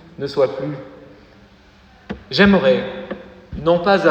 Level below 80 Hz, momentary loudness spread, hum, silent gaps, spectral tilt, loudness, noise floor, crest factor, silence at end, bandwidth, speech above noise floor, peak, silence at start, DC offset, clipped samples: -44 dBFS; 21 LU; none; none; -7 dB/octave; -17 LUFS; -48 dBFS; 18 dB; 0 s; 8.2 kHz; 32 dB; 0 dBFS; 0.2 s; under 0.1%; under 0.1%